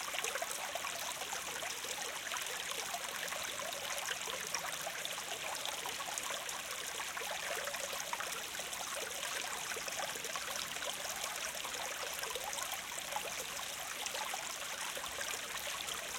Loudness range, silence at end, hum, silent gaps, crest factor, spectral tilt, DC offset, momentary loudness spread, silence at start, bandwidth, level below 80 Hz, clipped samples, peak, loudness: 1 LU; 0 s; none; none; 22 dB; 0.5 dB/octave; under 0.1%; 2 LU; 0 s; 17 kHz; -72 dBFS; under 0.1%; -18 dBFS; -39 LUFS